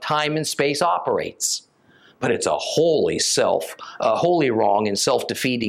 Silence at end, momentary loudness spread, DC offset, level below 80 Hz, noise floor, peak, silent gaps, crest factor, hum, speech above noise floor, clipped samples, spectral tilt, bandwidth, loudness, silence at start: 0 s; 6 LU; under 0.1%; -64 dBFS; -54 dBFS; -6 dBFS; none; 16 dB; none; 34 dB; under 0.1%; -3.5 dB/octave; 16.5 kHz; -21 LUFS; 0 s